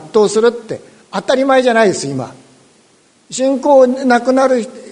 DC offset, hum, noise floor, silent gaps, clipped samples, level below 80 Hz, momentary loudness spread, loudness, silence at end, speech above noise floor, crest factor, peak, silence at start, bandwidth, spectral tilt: under 0.1%; none; -51 dBFS; none; under 0.1%; -60 dBFS; 16 LU; -13 LUFS; 0 s; 39 dB; 14 dB; 0 dBFS; 0 s; 10.5 kHz; -4.5 dB/octave